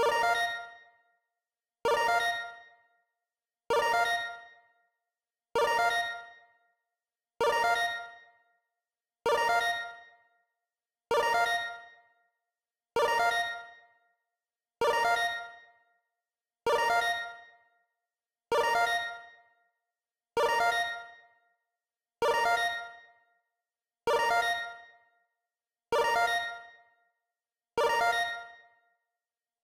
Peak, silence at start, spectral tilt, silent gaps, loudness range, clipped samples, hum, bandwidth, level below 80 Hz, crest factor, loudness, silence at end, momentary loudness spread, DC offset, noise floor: -16 dBFS; 0 s; -1 dB/octave; none; 3 LU; under 0.1%; none; 16 kHz; -68 dBFS; 16 dB; -29 LUFS; 1.1 s; 16 LU; under 0.1%; under -90 dBFS